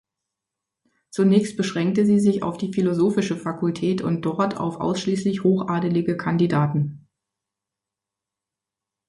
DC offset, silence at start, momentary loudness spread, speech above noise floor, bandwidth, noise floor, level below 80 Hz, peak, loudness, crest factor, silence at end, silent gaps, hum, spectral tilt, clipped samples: under 0.1%; 1.15 s; 7 LU; 66 dB; 11.5 kHz; -87 dBFS; -60 dBFS; -6 dBFS; -22 LUFS; 18 dB; 2.1 s; none; none; -7 dB/octave; under 0.1%